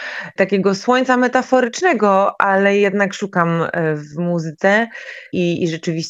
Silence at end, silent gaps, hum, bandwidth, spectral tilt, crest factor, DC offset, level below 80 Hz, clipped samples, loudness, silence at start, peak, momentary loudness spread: 0 s; none; none; 8.2 kHz; -5.5 dB/octave; 16 dB; under 0.1%; -64 dBFS; under 0.1%; -17 LUFS; 0 s; 0 dBFS; 7 LU